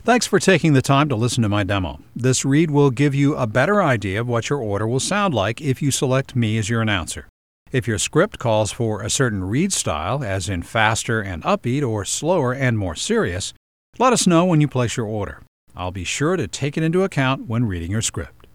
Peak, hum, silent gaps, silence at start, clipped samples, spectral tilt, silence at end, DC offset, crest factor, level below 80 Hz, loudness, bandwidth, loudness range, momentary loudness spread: 0 dBFS; none; 7.29-7.66 s, 13.57-13.93 s, 15.48-15.67 s; 0.05 s; under 0.1%; -5 dB/octave; 0.25 s; 0.3%; 20 dB; -46 dBFS; -20 LUFS; 15.5 kHz; 3 LU; 8 LU